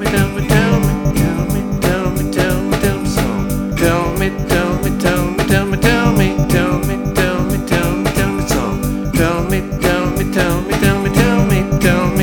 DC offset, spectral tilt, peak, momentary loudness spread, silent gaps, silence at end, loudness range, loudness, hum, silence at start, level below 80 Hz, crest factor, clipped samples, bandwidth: under 0.1%; -5.5 dB/octave; 0 dBFS; 5 LU; none; 0 s; 2 LU; -15 LUFS; none; 0 s; -24 dBFS; 14 dB; under 0.1%; over 20 kHz